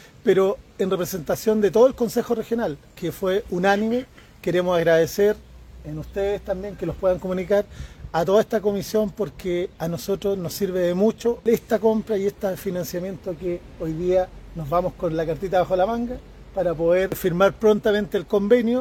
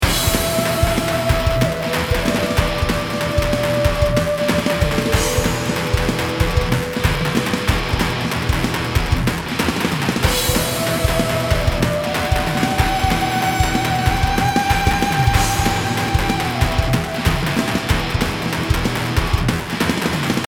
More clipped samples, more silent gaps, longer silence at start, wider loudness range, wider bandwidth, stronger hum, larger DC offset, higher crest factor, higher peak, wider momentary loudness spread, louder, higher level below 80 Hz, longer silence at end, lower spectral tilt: neither; neither; first, 0.25 s vs 0 s; about the same, 3 LU vs 2 LU; second, 17 kHz vs 19.5 kHz; neither; neither; about the same, 18 dB vs 16 dB; about the same, -4 dBFS vs -2 dBFS; first, 12 LU vs 3 LU; second, -23 LUFS vs -18 LUFS; second, -46 dBFS vs -26 dBFS; about the same, 0 s vs 0 s; first, -6 dB/octave vs -4.5 dB/octave